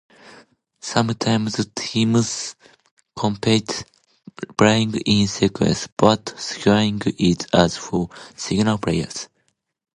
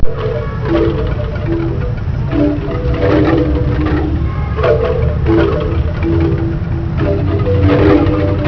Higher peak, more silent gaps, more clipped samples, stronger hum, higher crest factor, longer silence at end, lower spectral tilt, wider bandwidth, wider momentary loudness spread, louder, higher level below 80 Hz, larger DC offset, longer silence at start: about the same, 0 dBFS vs 0 dBFS; first, 2.91-2.97 s, 5.92-5.97 s vs none; neither; neither; first, 20 dB vs 12 dB; first, 0.7 s vs 0 s; second, -5 dB/octave vs -9.5 dB/octave; first, 11 kHz vs 5.4 kHz; first, 13 LU vs 7 LU; second, -20 LUFS vs -14 LUFS; second, -46 dBFS vs -20 dBFS; neither; first, 0.85 s vs 0 s